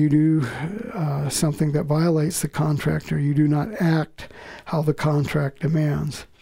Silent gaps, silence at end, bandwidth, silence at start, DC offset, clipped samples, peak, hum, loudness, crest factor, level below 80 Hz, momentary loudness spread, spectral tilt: none; 0.15 s; 16 kHz; 0 s; under 0.1%; under 0.1%; -8 dBFS; none; -22 LUFS; 14 dB; -48 dBFS; 10 LU; -6.5 dB/octave